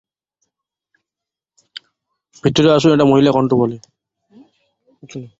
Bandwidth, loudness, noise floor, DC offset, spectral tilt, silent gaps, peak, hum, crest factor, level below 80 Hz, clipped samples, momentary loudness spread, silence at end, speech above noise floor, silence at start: 8 kHz; -14 LUFS; -86 dBFS; under 0.1%; -6.5 dB/octave; none; -2 dBFS; none; 18 dB; -52 dBFS; under 0.1%; 25 LU; 0.15 s; 73 dB; 2.45 s